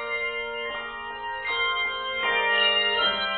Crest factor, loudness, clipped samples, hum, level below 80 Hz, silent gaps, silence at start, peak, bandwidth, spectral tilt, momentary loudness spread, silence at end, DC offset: 16 dB; -24 LUFS; under 0.1%; none; -56 dBFS; none; 0 s; -12 dBFS; 4.7 kHz; -4.5 dB/octave; 12 LU; 0 s; under 0.1%